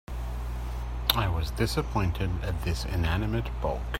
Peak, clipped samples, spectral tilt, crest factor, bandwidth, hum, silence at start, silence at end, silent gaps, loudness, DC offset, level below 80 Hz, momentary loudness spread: -2 dBFS; under 0.1%; -5.5 dB/octave; 26 dB; 16 kHz; none; 0.1 s; 0 s; none; -30 LUFS; under 0.1%; -34 dBFS; 9 LU